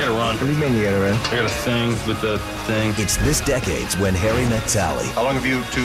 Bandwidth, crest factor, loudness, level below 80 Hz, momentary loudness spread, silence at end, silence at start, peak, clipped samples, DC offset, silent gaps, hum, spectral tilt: 16 kHz; 14 dB; -20 LUFS; -34 dBFS; 3 LU; 0 s; 0 s; -6 dBFS; under 0.1%; 0.2%; none; none; -4.5 dB/octave